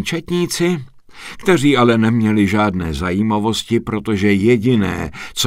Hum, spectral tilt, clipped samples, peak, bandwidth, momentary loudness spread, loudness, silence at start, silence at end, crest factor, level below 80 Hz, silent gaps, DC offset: none; -5.5 dB/octave; under 0.1%; 0 dBFS; 16 kHz; 10 LU; -16 LUFS; 0 s; 0 s; 16 dB; -40 dBFS; none; under 0.1%